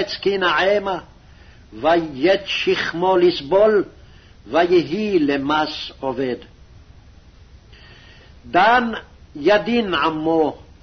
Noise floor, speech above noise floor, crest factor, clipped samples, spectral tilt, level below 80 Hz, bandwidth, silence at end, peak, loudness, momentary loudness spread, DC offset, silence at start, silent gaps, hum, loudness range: -46 dBFS; 27 dB; 16 dB; under 0.1%; -5.5 dB/octave; -48 dBFS; 6.4 kHz; 0.25 s; -4 dBFS; -18 LUFS; 11 LU; under 0.1%; 0 s; none; none; 6 LU